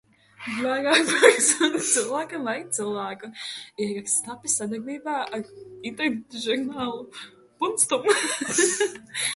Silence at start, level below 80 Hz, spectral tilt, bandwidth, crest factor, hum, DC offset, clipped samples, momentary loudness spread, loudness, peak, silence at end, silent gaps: 0.4 s; -70 dBFS; -1.5 dB/octave; 12 kHz; 24 dB; none; under 0.1%; under 0.1%; 15 LU; -23 LUFS; -2 dBFS; 0 s; none